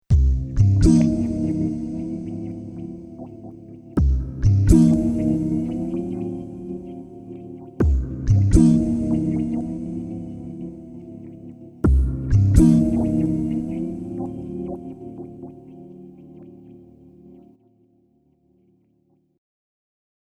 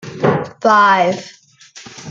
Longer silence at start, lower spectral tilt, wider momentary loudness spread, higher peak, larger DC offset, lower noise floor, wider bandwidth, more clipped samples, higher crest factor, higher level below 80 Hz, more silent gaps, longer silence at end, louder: about the same, 0.1 s vs 0.05 s; first, -9 dB/octave vs -5 dB/octave; about the same, 23 LU vs 21 LU; about the same, 0 dBFS vs -2 dBFS; neither; first, -64 dBFS vs -40 dBFS; first, 11.5 kHz vs 7.8 kHz; neither; first, 20 dB vs 14 dB; first, -28 dBFS vs -58 dBFS; neither; first, 3.5 s vs 0 s; second, -21 LUFS vs -13 LUFS